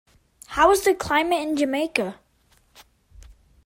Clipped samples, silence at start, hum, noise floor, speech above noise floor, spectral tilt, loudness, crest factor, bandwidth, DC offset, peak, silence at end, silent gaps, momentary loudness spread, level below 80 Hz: under 0.1%; 0.5 s; none; -62 dBFS; 41 dB; -3.5 dB/octave; -22 LUFS; 22 dB; 16.5 kHz; under 0.1%; -2 dBFS; 0.35 s; none; 10 LU; -50 dBFS